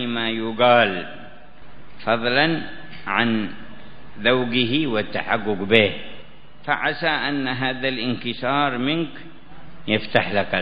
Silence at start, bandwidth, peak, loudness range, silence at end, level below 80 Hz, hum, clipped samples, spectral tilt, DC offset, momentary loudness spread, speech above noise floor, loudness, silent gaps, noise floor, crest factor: 0 s; 5.2 kHz; 0 dBFS; 2 LU; 0 s; -54 dBFS; none; under 0.1%; -7.5 dB/octave; 2%; 18 LU; 23 dB; -21 LUFS; none; -44 dBFS; 22 dB